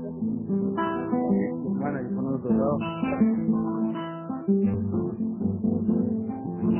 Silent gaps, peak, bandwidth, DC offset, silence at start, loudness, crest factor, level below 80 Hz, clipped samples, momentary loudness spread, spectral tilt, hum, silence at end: none; -12 dBFS; 3.2 kHz; under 0.1%; 0 s; -27 LUFS; 14 dB; -52 dBFS; under 0.1%; 6 LU; -12.5 dB/octave; none; 0 s